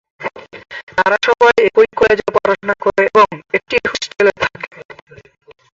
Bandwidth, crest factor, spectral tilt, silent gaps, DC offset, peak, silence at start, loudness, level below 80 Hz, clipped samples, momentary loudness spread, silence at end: 7.8 kHz; 14 dB; -4 dB/octave; 0.83-0.87 s; under 0.1%; 0 dBFS; 0.2 s; -14 LUFS; -50 dBFS; under 0.1%; 16 LU; 0.95 s